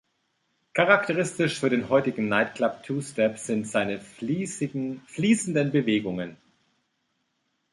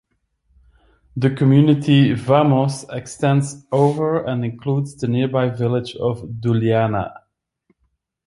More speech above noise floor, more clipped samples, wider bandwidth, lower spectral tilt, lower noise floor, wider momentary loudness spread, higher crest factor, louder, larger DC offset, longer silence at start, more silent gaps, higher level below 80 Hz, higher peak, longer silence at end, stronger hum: about the same, 50 dB vs 52 dB; neither; about the same, 11.5 kHz vs 11.5 kHz; second, -5 dB/octave vs -7.5 dB/octave; first, -75 dBFS vs -69 dBFS; about the same, 11 LU vs 10 LU; first, 24 dB vs 16 dB; second, -25 LUFS vs -18 LUFS; neither; second, 0.75 s vs 1.15 s; neither; second, -66 dBFS vs -52 dBFS; about the same, -4 dBFS vs -2 dBFS; first, 1.4 s vs 1.15 s; neither